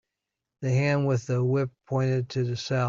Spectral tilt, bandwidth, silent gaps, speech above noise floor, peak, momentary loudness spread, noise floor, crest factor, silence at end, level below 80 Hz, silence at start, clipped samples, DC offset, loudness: -7 dB/octave; 7.4 kHz; none; 60 dB; -12 dBFS; 5 LU; -86 dBFS; 14 dB; 0 s; -62 dBFS; 0.6 s; under 0.1%; under 0.1%; -27 LUFS